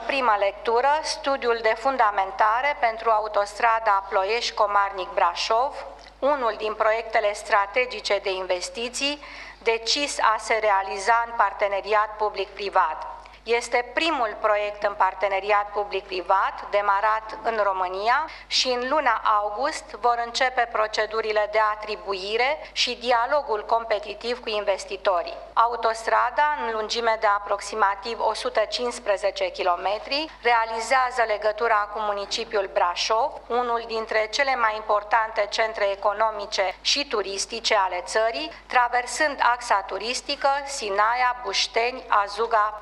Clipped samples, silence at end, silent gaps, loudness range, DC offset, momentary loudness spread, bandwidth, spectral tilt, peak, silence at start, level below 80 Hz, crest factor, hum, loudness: under 0.1%; 0 s; none; 2 LU; under 0.1%; 6 LU; 12 kHz; -1 dB/octave; -4 dBFS; 0 s; -54 dBFS; 18 dB; 50 Hz at -55 dBFS; -23 LUFS